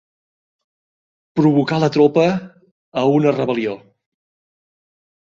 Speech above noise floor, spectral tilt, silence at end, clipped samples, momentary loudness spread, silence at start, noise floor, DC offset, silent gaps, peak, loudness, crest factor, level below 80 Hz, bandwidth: over 74 dB; -7.5 dB/octave; 1.45 s; under 0.1%; 12 LU; 1.35 s; under -90 dBFS; under 0.1%; 2.71-2.92 s; -2 dBFS; -17 LUFS; 18 dB; -60 dBFS; 7.4 kHz